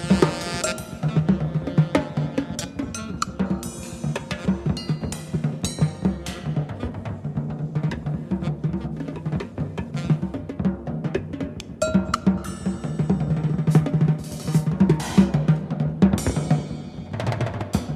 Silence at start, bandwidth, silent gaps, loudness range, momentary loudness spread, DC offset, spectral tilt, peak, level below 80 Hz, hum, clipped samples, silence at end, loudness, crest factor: 0 s; 13.5 kHz; none; 6 LU; 10 LU; under 0.1%; -6.5 dB/octave; -2 dBFS; -40 dBFS; none; under 0.1%; 0 s; -25 LUFS; 20 dB